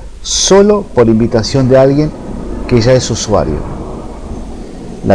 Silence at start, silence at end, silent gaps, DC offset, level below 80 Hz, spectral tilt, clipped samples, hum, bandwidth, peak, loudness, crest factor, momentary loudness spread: 0 s; 0 s; none; under 0.1%; -26 dBFS; -5 dB/octave; under 0.1%; none; 10.5 kHz; 0 dBFS; -10 LUFS; 12 dB; 18 LU